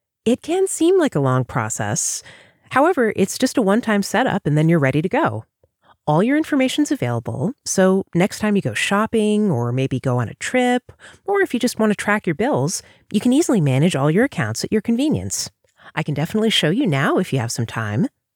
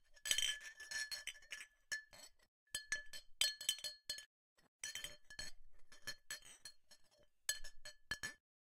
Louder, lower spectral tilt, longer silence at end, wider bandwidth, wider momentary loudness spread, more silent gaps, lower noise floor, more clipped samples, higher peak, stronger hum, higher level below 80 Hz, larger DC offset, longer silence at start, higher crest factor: first, -19 LUFS vs -44 LUFS; first, -5 dB/octave vs 2 dB/octave; about the same, 0.3 s vs 0.35 s; first, 20 kHz vs 16 kHz; second, 7 LU vs 19 LU; second, none vs 2.48-2.66 s, 4.26-4.56 s, 4.68-4.79 s; second, -57 dBFS vs -70 dBFS; neither; first, -4 dBFS vs -16 dBFS; neither; first, -56 dBFS vs -66 dBFS; neither; first, 0.25 s vs 0.1 s; second, 16 dB vs 32 dB